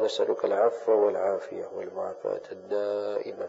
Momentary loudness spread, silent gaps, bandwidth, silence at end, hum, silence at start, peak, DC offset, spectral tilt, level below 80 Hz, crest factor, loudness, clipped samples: 12 LU; none; 8 kHz; 0 s; none; 0 s; -10 dBFS; under 0.1%; -4.5 dB/octave; -84 dBFS; 18 dB; -28 LUFS; under 0.1%